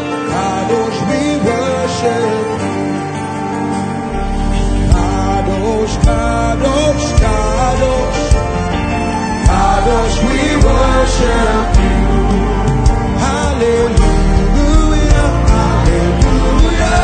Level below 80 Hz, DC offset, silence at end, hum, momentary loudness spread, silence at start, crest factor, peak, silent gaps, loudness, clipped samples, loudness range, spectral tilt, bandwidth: -16 dBFS; under 0.1%; 0 s; none; 5 LU; 0 s; 12 dB; 0 dBFS; none; -14 LUFS; under 0.1%; 4 LU; -6 dB/octave; 9.4 kHz